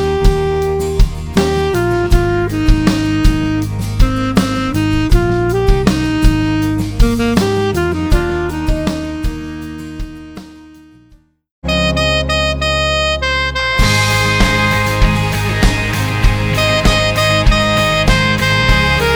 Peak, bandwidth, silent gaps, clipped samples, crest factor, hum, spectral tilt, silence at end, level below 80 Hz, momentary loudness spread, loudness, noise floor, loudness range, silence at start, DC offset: 0 dBFS; over 20 kHz; 11.51-11.62 s; under 0.1%; 14 dB; none; -5 dB/octave; 0 s; -18 dBFS; 7 LU; -14 LUFS; -48 dBFS; 7 LU; 0 s; under 0.1%